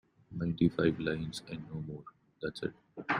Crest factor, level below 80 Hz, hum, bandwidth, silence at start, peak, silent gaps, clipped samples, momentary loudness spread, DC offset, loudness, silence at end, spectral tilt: 20 dB; -60 dBFS; none; 11 kHz; 0.3 s; -14 dBFS; none; under 0.1%; 16 LU; under 0.1%; -35 LUFS; 0 s; -6.5 dB/octave